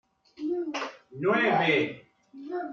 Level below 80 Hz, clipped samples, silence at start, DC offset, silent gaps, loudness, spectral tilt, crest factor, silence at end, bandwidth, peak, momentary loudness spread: -74 dBFS; under 0.1%; 0.4 s; under 0.1%; none; -27 LUFS; -5.5 dB/octave; 18 dB; 0 s; 7.4 kHz; -12 dBFS; 15 LU